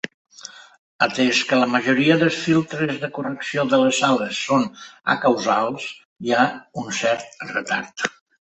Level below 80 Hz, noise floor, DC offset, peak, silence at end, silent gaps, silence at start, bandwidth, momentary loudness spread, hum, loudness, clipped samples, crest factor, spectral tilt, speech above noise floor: -64 dBFS; -42 dBFS; under 0.1%; -2 dBFS; 0.4 s; 0.14-0.25 s, 0.79-0.99 s, 6.05-6.16 s; 0.05 s; 8.4 kHz; 14 LU; none; -20 LUFS; under 0.1%; 20 dB; -4.5 dB/octave; 22 dB